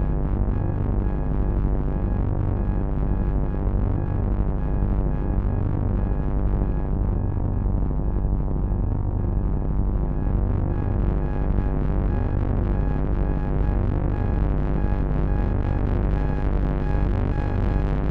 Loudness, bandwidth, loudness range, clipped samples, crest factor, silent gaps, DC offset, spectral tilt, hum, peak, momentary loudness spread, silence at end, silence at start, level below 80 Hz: -25 LUFS; 3.5 kHz; 1 LU; under 0.1%; 14 dB; none; under 0.1%; -11 dB/octave; none; -8 dBFS; 1 LU; 0 s; 0 s; -24 dBFS